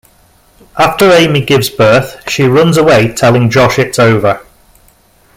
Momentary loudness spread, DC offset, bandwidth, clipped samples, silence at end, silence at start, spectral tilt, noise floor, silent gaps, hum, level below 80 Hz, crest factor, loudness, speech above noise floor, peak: 6 LU; under 0.1%; 16.5 kHz; under 0.1%; 1 s; 0.75 s; -5.5 dB/octave; -47 dBFS; none; none; -40 dBFS; 10 dB; -8 LUFS; 38 dB; 0 dBFS